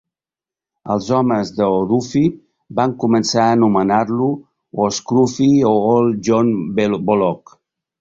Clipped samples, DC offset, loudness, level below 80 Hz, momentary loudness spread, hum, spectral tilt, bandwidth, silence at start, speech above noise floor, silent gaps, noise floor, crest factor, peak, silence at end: under 0.1%; under 0.1%; -16 LUFS; -52 dBFS; 8 LU; none; -6 dB/octave; 7.8 kHz; 0.85 s; 75 dB; none; -90 dBFS; 14 dB; -2 dBFS; 0.65 s